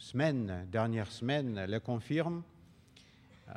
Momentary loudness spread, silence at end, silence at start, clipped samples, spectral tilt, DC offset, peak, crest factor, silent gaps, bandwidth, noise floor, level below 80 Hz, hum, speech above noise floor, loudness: 5 LU; 0 s; 0 s; under 0.1%; -7 dB/octave; under 0.1%; -18 dBFS; 18 dB; none; 11 kHz; -61 dBFS; -70 dBFS; none; 27 dB; -35 LUFS